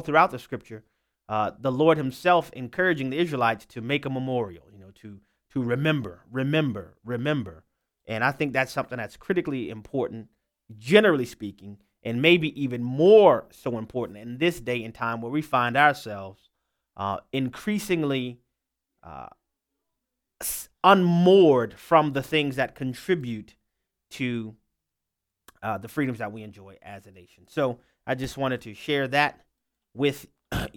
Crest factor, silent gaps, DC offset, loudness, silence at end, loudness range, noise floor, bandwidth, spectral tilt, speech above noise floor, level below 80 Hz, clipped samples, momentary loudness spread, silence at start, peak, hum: 24 dB; none; under 0.1%; -24 LUFS; 0.05 s; 11 LU; -85 dBFS; 18 kHz; -6 dB/octave; 60 dB; -56 dBFS; under 0.1%; 19 LU; 0 s; -2 dBFS; none